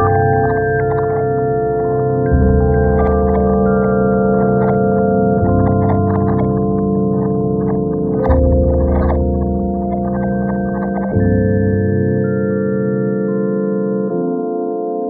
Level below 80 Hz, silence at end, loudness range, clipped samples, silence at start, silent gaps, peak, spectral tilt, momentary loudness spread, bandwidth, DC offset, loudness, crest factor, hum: -24 dBFS; 0 s; 3 LU; under 0.1%; 0 s; none; 0 dBFS; -13 dB/octave; 5 LU; 2.4 kHz; under 0.1%; -15 LUFS; 14 dB; none